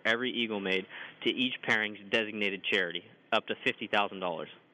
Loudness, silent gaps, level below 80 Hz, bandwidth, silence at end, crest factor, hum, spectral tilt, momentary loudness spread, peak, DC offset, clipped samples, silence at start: -31 LUFS; none; -82 dBFS; 12 kHz; 0.15 s; 18 dB; none; -4 dB/octave; 7 LU; -14 dBFS; under 0.1%; under 0.1%; 0.05 s